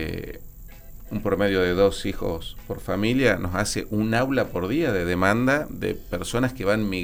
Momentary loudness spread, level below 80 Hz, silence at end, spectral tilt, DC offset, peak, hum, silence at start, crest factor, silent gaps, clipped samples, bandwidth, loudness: 13 LU; -40 dBFS; 0 s; -5.5 dB/octave; under 0.1%; -6 dBFS; none; 0 s; 18 dB; none; under 0.1%; 17.5 kHz; -24 LUFS